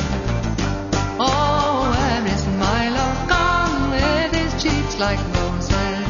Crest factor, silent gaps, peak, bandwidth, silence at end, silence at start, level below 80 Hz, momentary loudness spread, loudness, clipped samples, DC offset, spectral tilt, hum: 16 dB; none; -2 dBFS; 7.4 kHz; 0 s; 0 s; -28 dBFS; 5 LU; -20 LUFS; under 0.1%; under 0.1%; -5 dB/octave; none